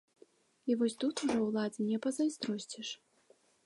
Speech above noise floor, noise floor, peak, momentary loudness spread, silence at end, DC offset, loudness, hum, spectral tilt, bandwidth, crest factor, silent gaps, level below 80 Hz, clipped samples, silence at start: 34 dB; -68 dBFS; -20 dBFS; 10 LU; 0.7 s; under 0.1%; -35 LUFS; none; -4.5 dB/octave; 11.5 kHz; 16 dB; none; -76 dBFS; under 0.1%; 0.65 s